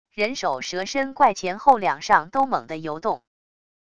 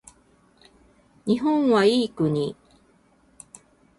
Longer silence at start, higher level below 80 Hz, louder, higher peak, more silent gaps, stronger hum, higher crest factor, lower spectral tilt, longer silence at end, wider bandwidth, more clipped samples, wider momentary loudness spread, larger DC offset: second, 0.15 s vs 1.25 s; about the same, -60 dBFS vs -62 dBFS; about the same, -22 LUFS vs -22 LUFS; first, -2 dBFS vs -8 dBFS; neither; neither; about the same, 22 dB vs 18 dB; second, -3.5 dB/octave vs -6 dB/octave; second, 0.8 s vs 1.45 s; second, 10 kHz vs 11.5 kHz; neither; about the same, 9 LU vs 11 LU; first, 0.4% vs under 0.1%